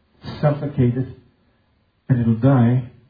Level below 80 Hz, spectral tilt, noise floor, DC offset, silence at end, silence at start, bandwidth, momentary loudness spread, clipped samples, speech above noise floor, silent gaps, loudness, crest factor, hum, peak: -50 dBFS; -11.5 dB/octave; -63 dBFS; under 0.1%; 0.2 s; 0.25 s; 5 kHz; 12 LU; under 0.1%; 45 dB; none; -19 LUFS; 16 dB; none; -4 dBFS